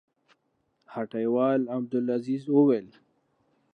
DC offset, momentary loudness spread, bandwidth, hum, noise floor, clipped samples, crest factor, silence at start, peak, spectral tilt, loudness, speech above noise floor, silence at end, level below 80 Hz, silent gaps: under 0.1%; 12 LU; 5.2 kHz; none; -74 dBFS; under 0.1%; 18 dB; 0.9 s; -10 dBFS; -9.5 dB/octave; -26 LUFS; 48 dB; 0.85 s; -82 dBFS; none